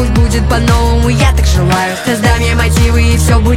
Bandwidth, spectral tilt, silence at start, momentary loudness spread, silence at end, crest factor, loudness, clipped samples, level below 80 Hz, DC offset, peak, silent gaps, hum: 16 kHz; -5.5 dB/octave; 0 s; 2 LU; 0 s; 8 dB; -11 LUFS; under 0.1%; -12 dBFS; under 0.1%; 0 dBFS; none; none